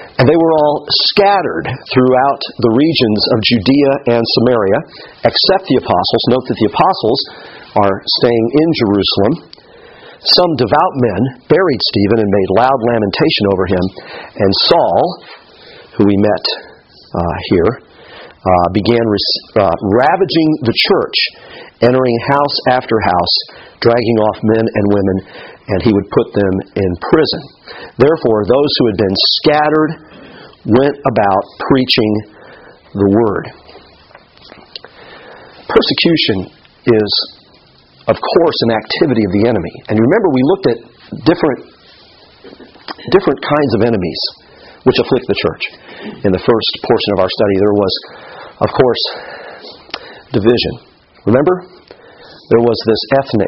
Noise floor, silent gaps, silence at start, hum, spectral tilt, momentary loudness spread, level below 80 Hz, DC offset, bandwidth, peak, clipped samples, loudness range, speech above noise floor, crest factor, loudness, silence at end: -46 dBFS; none; 0 s; none; -4 dB/octave; 13 LU; -44 dBFS; under 0.1%; 6 kHz; 0 dBFS; under 0.1%; 4 LU; 34 dB; 14 dB; -13 LUFS; 0 s